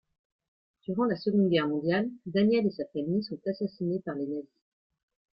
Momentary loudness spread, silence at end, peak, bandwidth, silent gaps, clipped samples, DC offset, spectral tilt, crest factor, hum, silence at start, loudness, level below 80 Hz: 10 LU; 0.9 s; -14 dBFS; 5.6 kHz; none; under 0.1%; under 0.1%; -10 dB/octave; 16 dB; none; 0.9 s; -29 LUFS; -70 dBFS